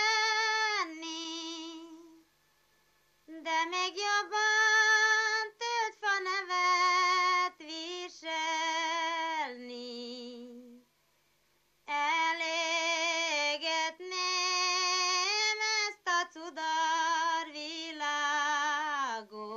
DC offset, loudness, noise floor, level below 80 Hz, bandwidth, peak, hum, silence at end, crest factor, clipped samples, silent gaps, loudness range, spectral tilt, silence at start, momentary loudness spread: under 0.1%; -30 LUFS; -72 dBFS; -86 dBFS; 14 kHz; -16 dBFS; 50 Hz at -85 dBFS; 0 s; 16 dB; under 0.1%; none; 9 LU; 1.5 dB/octave; 0 s; 14 LU